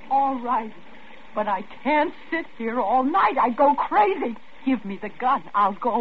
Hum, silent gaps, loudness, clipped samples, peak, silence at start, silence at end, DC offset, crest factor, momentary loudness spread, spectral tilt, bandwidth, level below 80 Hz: none; none; -23 LUFS; under 0.1%; -8 dBFS; 0 s; 0 s; 1%; 14 dB; 10 LU; -7.5 dB/octave; 5.8 kHz; -58 dBFS